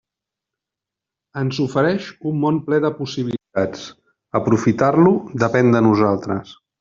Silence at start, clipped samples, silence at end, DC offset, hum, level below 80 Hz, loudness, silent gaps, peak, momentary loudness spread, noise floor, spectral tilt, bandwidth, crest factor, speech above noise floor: 1.35 s; under 0.1%; 0.25 s; under 0.1%; none; -56 dBFS; -19 LUFS; none; -2 dBFS; 11 LU; -86 dBFS; -6.5 dB/octave; 7.6 kHz; 16 dB; 68 dB